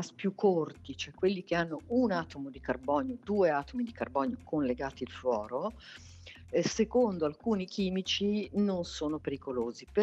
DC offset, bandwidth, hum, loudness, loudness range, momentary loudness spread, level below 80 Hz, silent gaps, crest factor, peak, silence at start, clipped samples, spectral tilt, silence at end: under 0.1%; 8.4 kHz; none; -32 LUFS; 2 LU; 11 LU; -58 dBFS; none; 18 dB; -16 dBFS; 0 s; under 0.1%; -5.5 dB/octave; 0 s